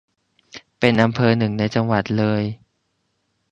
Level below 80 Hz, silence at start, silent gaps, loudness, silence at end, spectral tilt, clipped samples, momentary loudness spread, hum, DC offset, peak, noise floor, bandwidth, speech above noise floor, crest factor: -52 dBFS; 0.55 s; none; -19 LUFS; 0.95 s; -7.5 dB/octave; under 0.1%; 24 LU; none; under 0.1%; 0 dBFS; -70 dBFS; 8 kHz; 52 dB; 20 dB